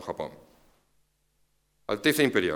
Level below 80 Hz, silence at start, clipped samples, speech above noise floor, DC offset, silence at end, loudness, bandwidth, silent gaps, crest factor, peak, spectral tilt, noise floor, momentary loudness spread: -64 dBFS; 0 s; under 0.1%; 45 dB; under 0.1%; 0 s; -26 LUFS; 19.5 kHz; none; 22 dB; -8 dBFS; -4 dB/octave; -71 dBFS; 17 LU